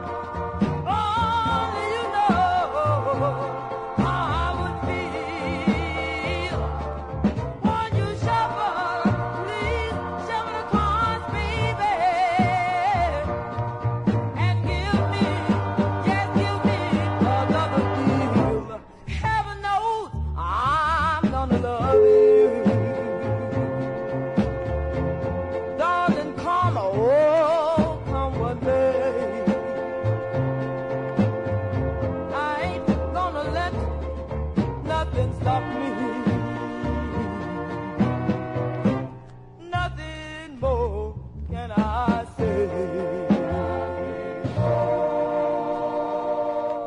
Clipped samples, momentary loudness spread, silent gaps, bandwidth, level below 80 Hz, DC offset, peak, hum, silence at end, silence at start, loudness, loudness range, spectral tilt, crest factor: under 0.1%; 8 LU; none; 10.5 kHz; -38 dBFS; under 0.1%; -8 dBFS; none; 0 s; 0 s; -24 LUFS; 6 LU; -7.5 dB/octave; 16 dB